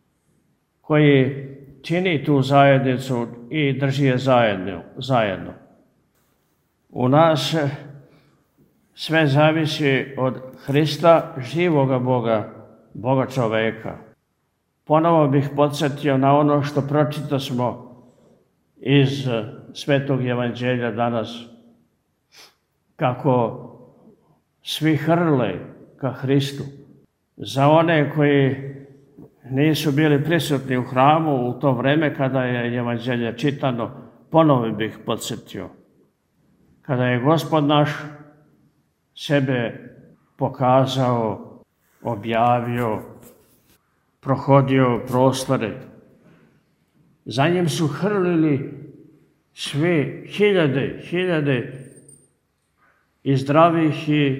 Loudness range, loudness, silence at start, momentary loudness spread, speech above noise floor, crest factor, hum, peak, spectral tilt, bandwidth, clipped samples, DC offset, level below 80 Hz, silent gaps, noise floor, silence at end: 5 LU; -20 LUFS; 0.9 s; 16 LU; 51 dB; 20 dB; none; 0 dBFS; -6.5 dB/octave; 16 kHz; under 0.1%; under 0.1%; -60 dBFS; none; -70 dBFS; 0 s